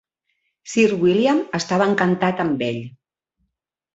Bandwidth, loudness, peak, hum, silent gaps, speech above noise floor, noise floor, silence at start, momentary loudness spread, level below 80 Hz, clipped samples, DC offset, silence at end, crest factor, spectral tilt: 8 kHz; -19 LUFS; -4 dBFS; none; none; 57 dB; -75 dBFS; 0.65 s; 9 LU; -60 dBFS; under 0.1%; under 0.1%; 1.05 s; 18 dB; -5.5 dB/octave